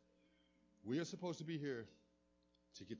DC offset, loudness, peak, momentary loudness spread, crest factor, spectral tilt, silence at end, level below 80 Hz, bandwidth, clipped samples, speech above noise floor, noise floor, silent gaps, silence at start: under 0.1%; -46 LUFS; -32 dBFS; 17 LU; 18 dB; -5.5 dB/octave; 0 s; -82 dBFS; 7.6 kHz; under 0.1%; 33 dB; -78 dBFS; none; 0.85 s